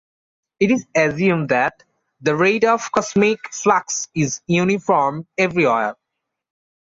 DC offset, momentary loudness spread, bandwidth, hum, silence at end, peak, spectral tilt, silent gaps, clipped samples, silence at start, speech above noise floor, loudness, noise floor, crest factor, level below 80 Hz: under 0.1%; 6 LU; 7.8 kHz; none; 0.9 s; -2 dBFS; -5 dB/octave; none; under 0.1%; 0.6 s; 62 dB; -18 LUFS; -80 dBFS; 16 dB; -58 dBFS